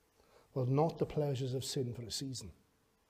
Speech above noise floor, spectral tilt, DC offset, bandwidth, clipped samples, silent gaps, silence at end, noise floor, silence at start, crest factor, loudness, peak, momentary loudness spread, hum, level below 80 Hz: 31 dB; -6 dB/octave; under 0.1%; 15.5 kHz; under 0.1%; none; 0.6 s; -67 dBFS; 0.55 s; 18 dB; -37 LUFS; -20 dBFS; 11 LU; none; -66 dBFS